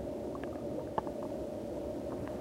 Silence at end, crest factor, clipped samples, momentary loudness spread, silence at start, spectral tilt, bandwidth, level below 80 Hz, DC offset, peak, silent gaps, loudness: 0 s; 22 dB; under 0.1%; 2 LU; 0 s; -7.5 dB/octave; 16 kHz; -56 dBFS; under 0.1%; -16 dBFS; none; -40 LUFS